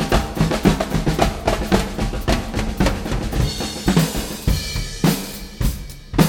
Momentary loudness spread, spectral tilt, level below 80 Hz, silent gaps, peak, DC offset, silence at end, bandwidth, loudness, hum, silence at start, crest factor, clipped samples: 7 LU; -5 dB/octave; -26 dBFS; none; 0 dBFS; under 0.1%; 0 s; 19.5 kHz; -21 LUFS; none; 0 s; 20 dB; under 0.1%